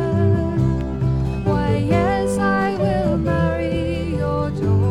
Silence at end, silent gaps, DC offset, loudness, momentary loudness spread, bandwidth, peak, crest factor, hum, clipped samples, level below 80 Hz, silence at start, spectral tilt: 0 s; none; under 0.1%; -20 LUFS; 4 LU; 11.5 kHz; -6 dBFS; 14 dB; none; under 0.1%; -32 dBFS; 0 s; -8 dB/octave